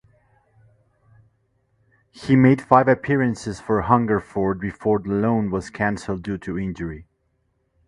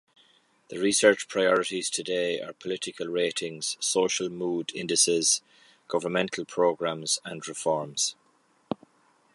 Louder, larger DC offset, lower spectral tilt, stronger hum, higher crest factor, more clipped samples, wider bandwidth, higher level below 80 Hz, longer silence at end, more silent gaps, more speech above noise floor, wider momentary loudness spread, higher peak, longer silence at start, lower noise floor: first, -21 LUFS vs -26 LUFS; neither; first, -8 dB/octave vs -2 dB/octave; neither; about the same, 22 dB vs 24 dB; neither; about the same, 11 kHz vs 11.5 kHz; first, -48 dBFS vs -74 dBFS; first, 0.85 s vs 0.6 s; neither; first, 48 dB vs 39 dB; about the same, 13 LU vs 12 LU; first, 0 dBFS vs -4 dBFS; first, 2.15 s vs 0.7 s; about the same, -69 dBFS vs -66 dBFS